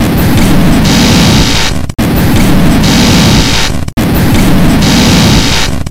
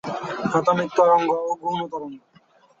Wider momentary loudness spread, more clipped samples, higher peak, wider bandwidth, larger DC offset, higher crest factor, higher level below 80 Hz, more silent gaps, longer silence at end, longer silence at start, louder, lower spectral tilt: second, 6 LU vs 14 LU; first, 5% vs under 0.1%; first, 0 dBFS vs -6 dBFS; first, over 20 kHz vs 7.8 kHz; neither; second, 6 dB vs 18 dB; first, -14 dBFS vs -66 dBFS; first, 3.93-3.97 s vs none; second, 0 s vs 0.6 s; about the same, 0 s vs 0.05 s; first, -7 LUFS vs -21 LUFS; second, -4.5 dB/octave vs -6 dB/octave